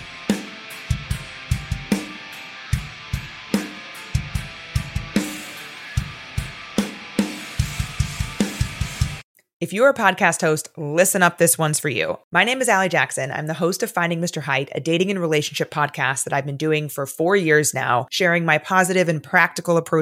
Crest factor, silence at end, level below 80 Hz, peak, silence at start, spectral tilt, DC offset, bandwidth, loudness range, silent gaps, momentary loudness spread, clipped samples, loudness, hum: 20 dB; 0 s; -38 dBFS; -2 dBFS; 0 s; -4 dB/octave; under 0.1%; 16.5 kHz; 9 LU; 9.23-9.35 s, 9.53-9.60 s, 12.24-12.31 s; 13 LU; under 0.1%; -21 LUFS; none